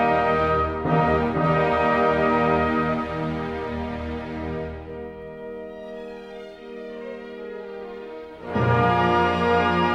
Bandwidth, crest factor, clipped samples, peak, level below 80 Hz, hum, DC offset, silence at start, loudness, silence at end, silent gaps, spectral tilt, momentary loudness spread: 9 kHz; 16 dB; under 0.1%; -8 dBFS; -42 dBFS; none; under 0.1%; 0 s; -22 LUFS; 0 s; none; -7.5 dB/octave; 17 LU